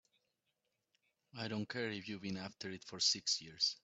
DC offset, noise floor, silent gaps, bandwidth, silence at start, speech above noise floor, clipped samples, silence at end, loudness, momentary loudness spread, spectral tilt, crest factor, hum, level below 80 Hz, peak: under 0.1%; -86 dBFS; none; 8.2 kHz; 1.35 s; 45 dB; under 0.1%; 0.1 s; -39 LUFS; 13 LU; -2 dB/octave; 22 dB; none; -80 dBFS; -20 dBFS